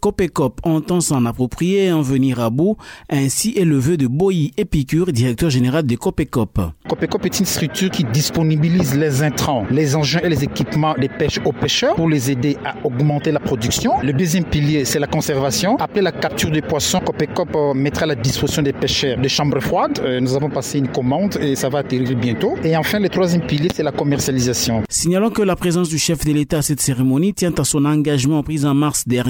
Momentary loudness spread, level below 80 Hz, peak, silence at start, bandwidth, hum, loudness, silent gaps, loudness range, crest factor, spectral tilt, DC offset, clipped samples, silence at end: 4 LU; -38 dBFS; -6 dBFS; 0.05 s; 17 kHz; none; -18 LUFS; none; 1 LU; 10 dB; -5 dB/octave; under 0.1%; under 0.1%; 0 s